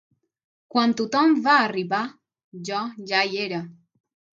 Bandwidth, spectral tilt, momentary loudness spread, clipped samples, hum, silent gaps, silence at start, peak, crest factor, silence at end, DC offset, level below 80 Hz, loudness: 7.6 kHz; -4.5 dB/octave; 14 LU; under 0.1%; none; 2.44-2.52 s; 0.75 s; -4 dBFS; 20 dB; 0.65 s; under 0.1%; -76 dBFS; -22 LUFS